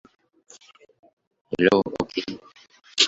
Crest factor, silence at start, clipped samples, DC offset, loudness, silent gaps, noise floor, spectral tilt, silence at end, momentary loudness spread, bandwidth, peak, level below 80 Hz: 26 dB; 1.5 s; under 0.1%; under 0.1%; -24 LUFS; none; -52 dBFS; -3 dB/octave; 0 s; 16 LU; 8.2 kHz; -2 dBFS; -60 dBFS